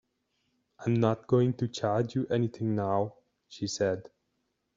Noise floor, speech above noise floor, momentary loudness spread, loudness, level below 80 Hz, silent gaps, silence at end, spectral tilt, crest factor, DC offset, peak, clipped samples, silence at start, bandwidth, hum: -79 dBFS; 50 dB; 10 LU; -30 LUFS; -68 dBFS; none; 0.75 s; -7 dB/octave; 20 dB; under 0.1%; -10 dBFS; under 0.1%; 0.8 s; 7.6 kHz; none